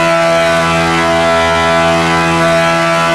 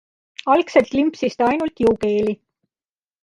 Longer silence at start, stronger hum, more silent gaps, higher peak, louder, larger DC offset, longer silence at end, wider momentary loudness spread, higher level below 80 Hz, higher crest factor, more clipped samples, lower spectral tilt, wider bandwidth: second, 0 s vs 0.45 s; neither; neither; about the same, -4 dBFS vs -2 dBFS; first, -10 LUFS vs -19 LUFS; neither; second, 0 s vs 0.9 s; second, 1 LU vs 12 LU; first, -40 dBFS vs -52 dBFS; second, 8 dB vs 18 dB; neither; second, -4.5 dB/octave vs -6 dB/octave; about the same, 12 kHz vs 11 kHz